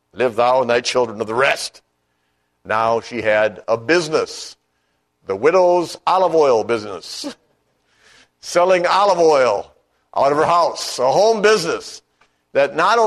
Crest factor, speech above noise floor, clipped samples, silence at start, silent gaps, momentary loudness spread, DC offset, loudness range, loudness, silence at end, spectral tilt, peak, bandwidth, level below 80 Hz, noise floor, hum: 16 dB; 51 dB; under 0.1%; 0.15 s; none; 14 LU; under 0.1%; 4 LU; -17 LUFS; 0 s; -3.5 dB/octave; -2 dBFS; 13 kHz; -60 dBFS; -68 dBFS; 60 Hz at -60 dBFS